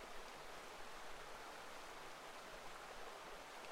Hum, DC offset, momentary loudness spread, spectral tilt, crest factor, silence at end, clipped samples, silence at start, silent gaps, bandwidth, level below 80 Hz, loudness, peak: none; under 0.1%; 1 LU; -2 dB/octave; 14 dB; 0 s; under 0.1%; 0 s; none; 16 kHz; -66 dBFS; -54 LUFS; -38 dBFS